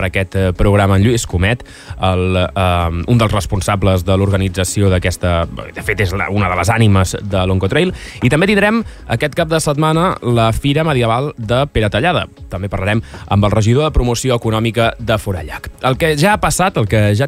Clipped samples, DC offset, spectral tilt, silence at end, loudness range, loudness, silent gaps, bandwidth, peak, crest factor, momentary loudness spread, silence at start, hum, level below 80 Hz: under 0.1%; under 0.1%; -5.5 dB/octave; 0 s; 1 LU; -15 LUFS; none; 15.5 kHz; -2 dBFS; 12 dB; 7 LU; 0 s; none; -28 dBFS